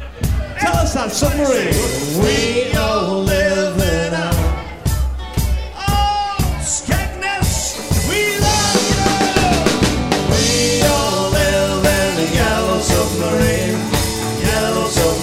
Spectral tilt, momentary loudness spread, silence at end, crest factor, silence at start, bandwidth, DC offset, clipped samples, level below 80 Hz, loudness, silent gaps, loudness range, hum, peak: -4 dB/octave; 6 LU; 0 s; 16 dB; 0 s; 16.5 kHz; under 0.1%; under 0.1%; -24 dBFS; -16 LUFS; none; 4 LU; none; 0 dBFS